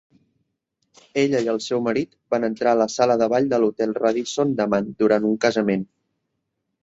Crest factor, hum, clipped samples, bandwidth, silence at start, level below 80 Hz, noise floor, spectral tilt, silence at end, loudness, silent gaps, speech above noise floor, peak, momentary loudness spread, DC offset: 18 dB; none; under 0.1%; 8 kHz; 1.15 s; -64 dBFS; -77 dBFS; -5.5 dB/octave; 1 s; -21 LUFS; none; 56 dB; -4 dBFS; 5 LU; under 0.1%